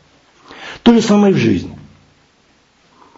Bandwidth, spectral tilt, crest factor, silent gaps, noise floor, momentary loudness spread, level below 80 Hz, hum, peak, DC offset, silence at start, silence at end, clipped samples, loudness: 8 kHz; -6 dB/octave; 16 dB; none; -54 dBFS; 22 LU; -46 dBFS; none; 0 dBFS; under 0.1%; 0.5 s; 1.45 s; under 0.1%; -13 LUFS